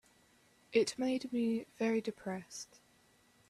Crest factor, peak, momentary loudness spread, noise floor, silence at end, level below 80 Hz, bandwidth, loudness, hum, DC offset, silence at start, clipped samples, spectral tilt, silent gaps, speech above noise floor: 22 dB; -16 dBFS; 14 LU; -68 dBFS; 0.85 s; -78 dBFS; 13 kHz; -36 LUFS; none; under 0.1%; 0.7 s; under 0.1%; -4.5 dB/octave; none; 33 dB